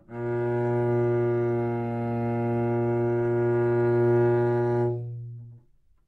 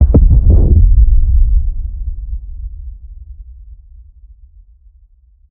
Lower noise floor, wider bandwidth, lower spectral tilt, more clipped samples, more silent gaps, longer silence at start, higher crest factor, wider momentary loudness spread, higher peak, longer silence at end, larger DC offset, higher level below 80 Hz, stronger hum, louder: first, -59 dBFS vs -47 dBFS; first, 4.1 kHz vs 1.4 kHz; second, -11 dB/octave vs -16.5 dB/octave; neither; neither; about the same, 0.1 s vs 0 s; about the same, 12 dB vs 12 dB; second, 8 LU vs 26 LU; second, -14 dBFS vs 0 dBFS; second, 0.5 s vs 2 s; neither; second, -58 dBFS vs -12 dBFS; neither; second, -25 LUFS vs -13 LUFS